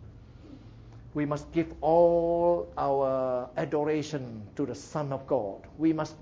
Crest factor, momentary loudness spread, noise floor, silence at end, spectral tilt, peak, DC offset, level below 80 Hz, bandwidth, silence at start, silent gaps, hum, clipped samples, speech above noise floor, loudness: 18 dB; 12 LU; -48 dBFS; 0 s; -7.5 dB/octave; -12 dBFS; under 0.1%; -54 dBFS; 7.8 kHz; 0 s; none; none; under 0.1%; 21 dB; -29 LUFS